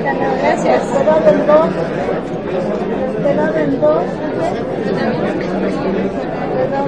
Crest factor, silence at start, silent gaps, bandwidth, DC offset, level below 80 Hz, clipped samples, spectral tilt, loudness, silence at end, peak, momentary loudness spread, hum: 16 dB; 0 s; none; 9.8 kHz; 0.7%; -42 dBFS; under 0.1%; -7 dB/octave; -16 LUFS; 0 s; 0 dBFS; 8 LU; none